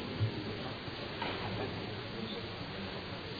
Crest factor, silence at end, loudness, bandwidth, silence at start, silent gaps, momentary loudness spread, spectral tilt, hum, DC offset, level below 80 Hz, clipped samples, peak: 16 dB; 0 s; -39 LUFS; 5 kHz; 0 s; none; 4 LU; -4 dB/octave; none; under 0.1%; -58 dBFS; under 0.1%; -22 dBFS